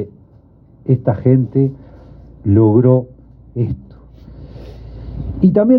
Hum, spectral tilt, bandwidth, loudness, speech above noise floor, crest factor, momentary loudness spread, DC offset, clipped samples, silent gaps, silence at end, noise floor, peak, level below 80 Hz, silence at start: none; -13.5 dB/octave; 2.9 kHz; -15 LUFS; 34 dB; 16 dB; 24 LU; under 0.1%; under 0.1%; none; 0 s; -46 dBFS; 0 dBFS; -38 dBFS; 0 s